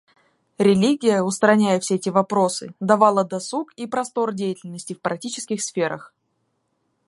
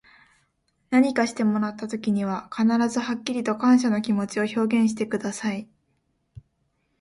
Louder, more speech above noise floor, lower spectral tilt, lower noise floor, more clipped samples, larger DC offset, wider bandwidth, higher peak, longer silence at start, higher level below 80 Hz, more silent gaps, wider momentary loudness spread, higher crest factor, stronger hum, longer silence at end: first, -21 LUFS vs -24 LUFS; about the same, 51 dB vs 49 dB; about the same, -5 dB/octave vs -5.5 dB/octave; about the same, -71 dBFS vs -71 dBFS; neither; neither; about the same, 11.5 kHz vs 11.5 kHz; first, -2 dBFS vs -8 dBFS; second, 0.6 s vs 0.9 s; about the same, -66 dBFS vs -64 dBFS; neither; first, 12 LU vs 9 LU; about the same, 20 dB vs 18 dB; neither; first, 1 s vs 0.6 s